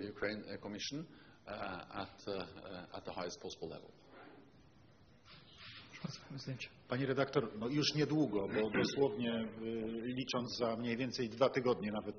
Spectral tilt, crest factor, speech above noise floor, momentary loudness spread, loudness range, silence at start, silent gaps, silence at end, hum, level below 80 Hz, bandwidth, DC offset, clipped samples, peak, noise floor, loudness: -4.5 dB/octave; 22 dB; 26 dB; 19 LU; 14 LU; 0 s; none; 0 s; none; -70 dBFS; 6.6 kHz; under 0.1%; under 0.1%; -18 dBFS; -65 dBFS; -39 LUFS